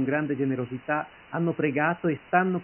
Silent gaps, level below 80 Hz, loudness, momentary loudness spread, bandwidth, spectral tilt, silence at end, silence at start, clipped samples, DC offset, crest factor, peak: none; -66 dBFS; -27 LUFS; 6 LU; 3.2 kHz; -11.5 dB/octave; 0 s; 0 s; under 0.1%; under 0.1%; 20 dB; -6 dBFS